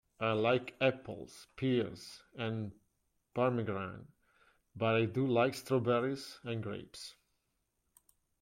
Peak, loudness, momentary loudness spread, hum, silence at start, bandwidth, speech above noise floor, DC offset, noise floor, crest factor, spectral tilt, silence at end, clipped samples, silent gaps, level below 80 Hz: -16 dBFS; -35 LUFS; 17 LU; none; 0.2 s; 16.5 kHz; 47 dB; under 0.1%; -82 dBFS; 20 dB; -6.5 dB/octave; 1.3 s; under 0.1%; none; -72 dBFS